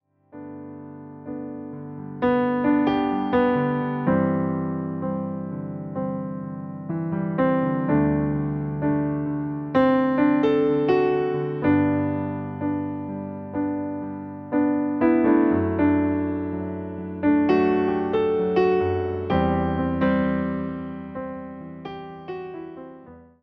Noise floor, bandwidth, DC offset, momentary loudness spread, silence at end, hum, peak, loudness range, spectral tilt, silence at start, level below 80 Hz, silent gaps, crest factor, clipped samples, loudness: -46 dBFS; 5.4 kHz; under 0.1%; 16 LU; 0.2 s; none; -8 dBFS; 5 LU; -10 dB/octave; 0.35 s; -48 dBFS; none; 16 dB; under 0.1%; -23 LUFS